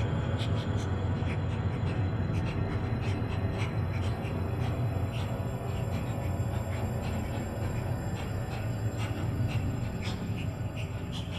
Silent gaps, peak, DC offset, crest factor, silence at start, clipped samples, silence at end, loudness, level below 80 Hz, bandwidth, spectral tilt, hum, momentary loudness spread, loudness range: none; -18 dBFS; under 0.1%; 14 dB; 0 s; under 0.1%; 0 s; -33 LUFS; -42 dBFS; 12.5 kHz; -7 dB/octave; none; 3 LU; 2 LU